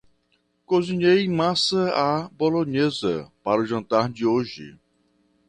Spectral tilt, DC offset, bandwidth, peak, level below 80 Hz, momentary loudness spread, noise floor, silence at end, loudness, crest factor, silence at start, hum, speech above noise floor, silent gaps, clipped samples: -5.5 dB/octave; under 0.1%; 10.5 kHz; -6 dBFS; -60 dBFS; 7 LU; -68 dBFS; 0.75 s; -22 LUFS; 18 dB; 0.7 s; none; 46 dB; none; under 0.1%